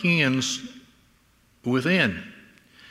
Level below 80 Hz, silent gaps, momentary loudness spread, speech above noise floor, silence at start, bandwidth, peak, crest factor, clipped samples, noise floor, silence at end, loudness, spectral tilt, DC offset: -64 dBFS; none; 19 LU; 38 dB; 0 s; 15 kHz; -6 dBFS; 20 dB; under 0.1%; -61 dBFS; 0.55 s; -23 LUFS; -4.5 dB/octave; under 0.1%